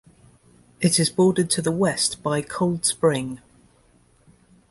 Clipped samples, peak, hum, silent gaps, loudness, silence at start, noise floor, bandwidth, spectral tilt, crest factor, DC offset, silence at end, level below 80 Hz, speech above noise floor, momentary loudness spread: under 0.1%; -6 dBFS; 60 Hz at -45 dBFS; none; -21 LUFS; 0.8 s; -58 dBFS; 12 kHz; -4 dB/octave; 18 dB; under 0.1%; 1.35 s; -58 dBFS; 37 dB; 8 LU